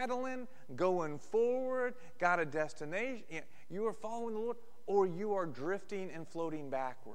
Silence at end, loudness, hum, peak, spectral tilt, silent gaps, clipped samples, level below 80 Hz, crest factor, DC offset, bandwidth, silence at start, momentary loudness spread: 0 s; -37 LUFS; none; -16 dBFS; -6 dB/octave; none; under 0.1%; -74 dBFS; 22 dB; 0.7%; 12.5 kHz; 0 s; 12 LU